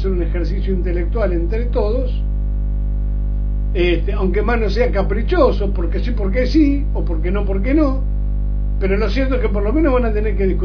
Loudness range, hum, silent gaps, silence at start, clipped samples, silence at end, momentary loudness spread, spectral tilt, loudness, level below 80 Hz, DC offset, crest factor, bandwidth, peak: 3 LU; 50 Hz at -20 dBFS; none; 0 s; under 0.1%; 0 s; 7 LU; -9 dB/octave; -19 LUFS; -18 dBFS; under 0.1%; 16 dB; 5.4 kHz; 0 dBFS